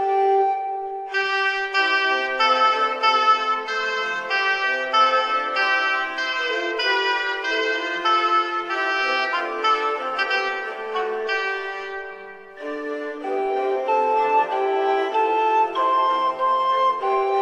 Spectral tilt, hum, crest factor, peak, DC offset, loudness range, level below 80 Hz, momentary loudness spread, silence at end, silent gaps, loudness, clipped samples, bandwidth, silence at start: -1 dB/octave; none; 16 dB; -6 dBFS; under 0.1%; 5 LU; -68 dBFS; 10 LU; 0 s; none; -21 LUFS; under 0.1%; 9.6 kHz; 0 s